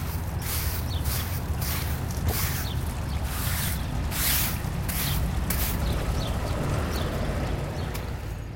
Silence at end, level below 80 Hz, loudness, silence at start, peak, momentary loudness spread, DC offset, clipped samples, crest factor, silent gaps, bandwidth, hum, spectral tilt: 0 s; -32 dBFS; -28 LUFS; 0 s; -10 dBFS; 5 LU; under 0.1%; under 0.1%; 18 dB; none; 17 kHz; none; -4.5 dB/octave